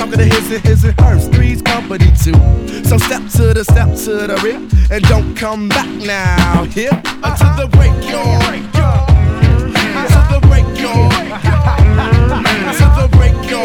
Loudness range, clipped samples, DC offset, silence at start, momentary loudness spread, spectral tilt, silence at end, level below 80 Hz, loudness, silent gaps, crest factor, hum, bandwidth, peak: 2 LU; 0.7%; under 0.1%; 0 s; 6 LU; -6 dB/octave; 0 s; -14 dBFS; -11 LUFS; none; 10 dB; none; 17.5 kHz; 0 dBFS